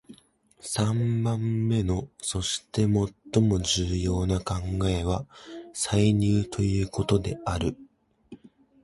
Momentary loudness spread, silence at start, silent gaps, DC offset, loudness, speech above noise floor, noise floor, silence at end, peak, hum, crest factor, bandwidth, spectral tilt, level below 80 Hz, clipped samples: 9 LU; 0.1 s; none; under 0.1%; -26 LUFS; 34 dB; -59 dBFS; 0.5 s; -10 dBFS; none; 18 dB; 11.5 kHz; -5.5 dB/octave; -40 dBFS; under 0.1%